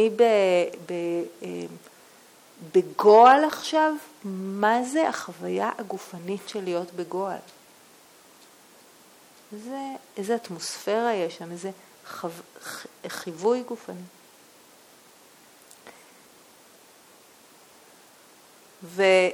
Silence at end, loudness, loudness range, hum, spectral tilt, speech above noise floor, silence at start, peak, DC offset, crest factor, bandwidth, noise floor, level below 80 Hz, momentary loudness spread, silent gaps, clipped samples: 0 s; -24 LUFS; 15 LU; none; -4.5 dB/octave; 30 dB; 0 s; -4 dBFS; under 0.1%; 22 dB; 18 kHz; -54 dBFS; -80 dBFS; 19 LU; none; under 0.1%